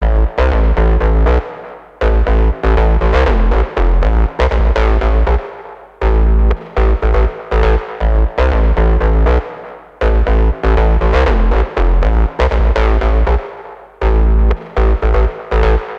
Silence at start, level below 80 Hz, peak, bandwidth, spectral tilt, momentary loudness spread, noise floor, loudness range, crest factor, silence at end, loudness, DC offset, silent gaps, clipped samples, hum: 0 s; -12 dBFS; 0 dBFS; 5.2 kHz; -8 dB/octave; 6 LU; -33 dBFS; 1 LU; 12 dB; 0 s; -14 LUFS; under 0.1%; none; under 0.1%; none